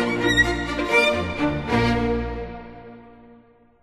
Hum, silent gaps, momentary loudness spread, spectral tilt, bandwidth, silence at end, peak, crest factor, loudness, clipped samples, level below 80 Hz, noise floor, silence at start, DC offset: none; none; 19 LU; -5 dB/octave; 13 kHz; 0.5 s; -6 dBFS; 18 dB; -21 LUFS; under 0.1%; -36 dBFS; -53 dBFS; 0 s; under 0.1%